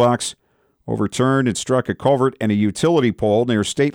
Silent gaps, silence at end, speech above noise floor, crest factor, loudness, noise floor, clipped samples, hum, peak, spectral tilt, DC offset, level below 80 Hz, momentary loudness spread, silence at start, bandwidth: none; 0.05 s; 23 dB; 14 dB; -19 LUFS; -41 dBFS; under 0.1%; none; -4 dBFS; -5.5 dB/octave; under 0.1%; -52 dBFS; 6 LU; 0 s; 16.5 kHz